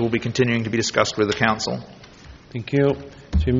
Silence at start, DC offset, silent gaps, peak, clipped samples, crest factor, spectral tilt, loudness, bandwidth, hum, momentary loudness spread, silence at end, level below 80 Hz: 0 s; under 0.1%; none; -2 dBFS; under 0.1%; 20 dB; -5 dB/octave; -22 LUFS; 7.6 kHz; none; 11 LU; 0 s; -34 dBFS